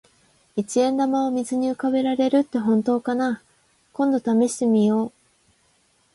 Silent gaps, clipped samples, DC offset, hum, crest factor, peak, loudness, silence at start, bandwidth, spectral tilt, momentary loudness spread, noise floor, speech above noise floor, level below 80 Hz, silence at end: none; under 0.1%; under 0.1%; none; 14 dB; -8 dBFS; -22 LUFS; 0.55 s; 11.5 kHz; -5.5 dB/octave; 8 LU; -63 dBFS; 42 dB; -68 dBFS; 1.05 s